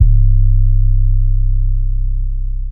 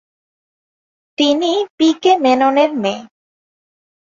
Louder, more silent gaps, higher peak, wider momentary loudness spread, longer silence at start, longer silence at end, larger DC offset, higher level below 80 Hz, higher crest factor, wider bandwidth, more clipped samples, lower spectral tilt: about the same, -17 LUFS vs -15 LUFS; second, none vs 1.70-1.78 s; about the same, 0 dBFS vs -2 dBFS; about the same, 9 LU vs 9 LU; second, 0 s vs 1.2 s; second, 0 s vs 1.1 s; first, 3% vs under 0.1%; first, -12 dBFS vs -64 dBFS; second, 10 dB vs 16 dB; second, 0.3 kHz vs 7.6 kHz; neither; first, -15 dB/octave vs -4 dB/octave